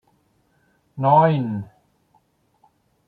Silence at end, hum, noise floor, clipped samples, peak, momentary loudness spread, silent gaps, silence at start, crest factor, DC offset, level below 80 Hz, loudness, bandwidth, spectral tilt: 1.45 s; none; -64 dBFS; under 0.1%; -2 dBFS; 26 LU; none; 0.95 s; 22 dB; under 0.1%; -64 dBFS; -19 LUFS; 4.7 kHz; -10.5 dB/octave